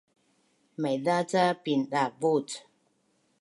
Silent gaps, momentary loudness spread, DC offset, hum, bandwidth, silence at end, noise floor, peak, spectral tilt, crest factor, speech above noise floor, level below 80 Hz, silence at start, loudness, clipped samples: none; 14 LU; under 0.1%; none; 11.5 kHz; 0.8 s; -71 dBFS; -12 dBFS; -5 dB/octave; 18 dB; 44 dB; -80 dBFS; 0.8 s; -28 LUFS; under 0.1%